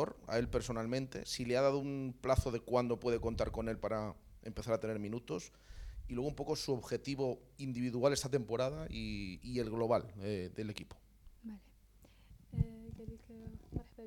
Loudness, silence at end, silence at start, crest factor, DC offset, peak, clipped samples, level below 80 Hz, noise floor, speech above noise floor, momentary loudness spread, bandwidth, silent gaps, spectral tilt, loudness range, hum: -38 LUFS; 0 s; 0 s; 20 dB; under 0.1%; -18 dBFS; under 0.1%; -52 dBFS; -63 dBFS; 26 dB; 18 LU; 19 kHz; none; -5.5 dB/octave; 6 LU; none